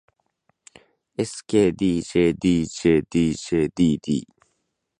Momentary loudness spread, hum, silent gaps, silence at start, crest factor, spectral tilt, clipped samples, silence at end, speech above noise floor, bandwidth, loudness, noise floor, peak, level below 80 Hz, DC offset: 9 LU; none; none; 1.2 s; 18 dB; -6 dB/octave; under 0.1%; 0.8 s; 54 dB; 10.5 kHz; -22 LUFS; -75 dBFS; -6 dBFS; -48 dBFS; under 0.1%